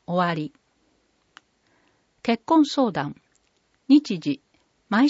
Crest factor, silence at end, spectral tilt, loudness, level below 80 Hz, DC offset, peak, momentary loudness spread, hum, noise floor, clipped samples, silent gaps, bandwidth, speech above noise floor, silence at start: 18 dB; 0 s; -6 dB/octave; -23 LUFS; -70 dBFS; under 0.1%; -6 dBFS; 13 LU; none; -67 dBFS; under 0.1%; none; 8 kHz; 46 dB; 0.1 s